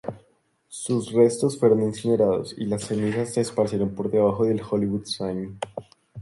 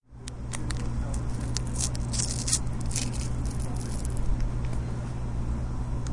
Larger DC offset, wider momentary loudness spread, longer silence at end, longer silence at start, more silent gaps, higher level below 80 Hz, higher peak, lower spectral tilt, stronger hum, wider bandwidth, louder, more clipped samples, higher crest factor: neither; first, 14 LU vs 6 LU; about the same, 0 s vs 0 s; about the same, 0.05 s vs 0.1 s; neither; second, -56 dBFS vs -32 dBFS; about the same, -6 dBFS vs -6 dBFS; first, -6 dB/octave vs -4 dB/octave; neither; about the same, 11.5 kHz vs 11.5 kHz; first, -24 LUFS vs -31 LUFS; neither; about the same, 18 dB vs 22 dB